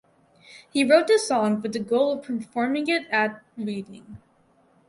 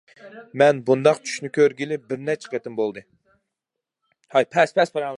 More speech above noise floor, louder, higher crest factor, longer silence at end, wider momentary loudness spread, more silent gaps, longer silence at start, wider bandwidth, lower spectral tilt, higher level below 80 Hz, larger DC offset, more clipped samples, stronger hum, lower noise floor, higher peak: second, 38 dB vs 64 dB; about the same, -23 LUFS vs -21 LUFS; about the same, 18 dB vs 20 dB; first, 0.7 s vs 0 s; first, 14 LU vs 10 LU; neither; first, 0.5 s vs 0.25 s; about the same, 11.5 kHz vs 11.5 kHz; about the same, -4.5 dB/octave vs -5 dB/octave; first, -68 dBFS vs -74 dBFS; neither; neither; neither; second, -61 dBFS vs -85 dBFS; second, -6 dBFS vs -2 dBFS